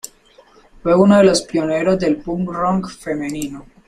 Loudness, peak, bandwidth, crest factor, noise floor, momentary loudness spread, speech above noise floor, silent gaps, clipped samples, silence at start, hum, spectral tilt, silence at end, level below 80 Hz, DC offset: -17 LUFS; 0 dBFS; 13.5 kHz; 16 dB; -49 dBFS; 14 LU; 33 dB; none; under 0.1%; 0.85 s; none; -5.5 dB/octave; 0.25 s; -44 dBFS; under 0.1%